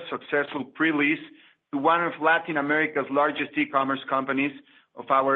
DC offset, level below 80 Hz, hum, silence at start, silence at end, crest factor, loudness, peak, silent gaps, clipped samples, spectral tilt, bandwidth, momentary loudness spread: under 0.1%; -76 dBFS; none; 0 s; 0 s; 18 dB; -25 LUFS; -8 dBFS; none; under 0.1%; -7.5 dB/octave; 4.2 kHz; 6 LU